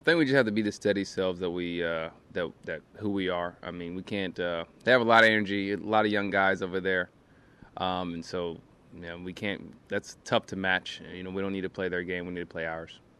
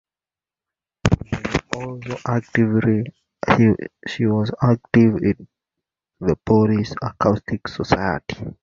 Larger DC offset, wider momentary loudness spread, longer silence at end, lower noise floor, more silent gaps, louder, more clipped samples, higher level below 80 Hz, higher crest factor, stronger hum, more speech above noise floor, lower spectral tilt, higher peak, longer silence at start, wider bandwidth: neither; first, 15 LU vs 12 LU; first, 0.25 s vs 0.1 s; second, -56 dBFS vs under -90 dBFS; neither; second, -29 LUFS vs -20 LUFS; neither; second, -64 dBFS vs -42 dBFS; about the same, 22 dB vs 20 dB; neither; second, 27 dB vs over 71 dB; second, -5 dB/octave vs -7.5 dB/octave; second, -8 dBFS vs 0 dBFS; second, 0.05 s vs 1.05 s; first, 12.5 kHz vs 7.6 kHz